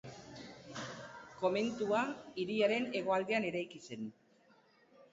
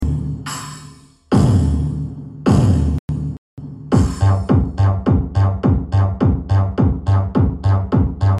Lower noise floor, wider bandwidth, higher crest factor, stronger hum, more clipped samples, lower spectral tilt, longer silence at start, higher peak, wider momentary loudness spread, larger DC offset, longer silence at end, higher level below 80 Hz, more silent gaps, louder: first, -68 dBFS vs -41 dBFS; second, 7.6 kHz vs 11.5 kHz; first, 20 dB vs 14 dB; neither; neither; second, -3.5 dB/octave vs -8 dB/octave; about the same, 0.05 s vs 0 s; second, -18 dBFS vs -2 dBFS; first, 18 LU vs 13 LU; neither; about the same, 0.05 s vs 0 s; second, -76 dBFS vs -26 dBFS; second, none vs 2.99-3.08 s, 3.38-3.57 s; second, -36 LUFS vs -17 LUFS